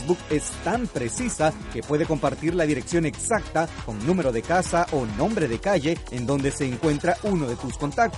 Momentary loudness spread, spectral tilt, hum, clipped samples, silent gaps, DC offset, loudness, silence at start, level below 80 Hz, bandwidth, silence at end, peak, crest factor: 4 LU; -5.5 dB/octave; none; under 0.1%; none; under 0.1%; -25 LUFS; 0 s; -40 dBFS; 11.5 kHz; 0 s; -8 dBFS; 16 dB